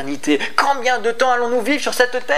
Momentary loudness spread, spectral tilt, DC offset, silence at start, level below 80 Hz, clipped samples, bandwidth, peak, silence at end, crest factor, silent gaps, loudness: 3 LU; -2.5 dB/octave; 5%; 0 s; -70 dBFS; under 0.1%; 15 kHz; 0 dBFS; 0 s; 18 dB; none; -17 LUFS